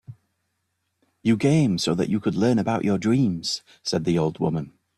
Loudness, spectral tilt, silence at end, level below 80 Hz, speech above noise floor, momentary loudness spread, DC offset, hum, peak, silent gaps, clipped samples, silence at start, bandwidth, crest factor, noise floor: -23 LUFS; -6 dB/octave; 0.3 s; -58 dBFS; 53 dB; 8 LU; under 0.1%; none; -8 dBFS; none; under 0.1%; 0.1 s; 12.5 kHz; 16 dB; -75 dBFS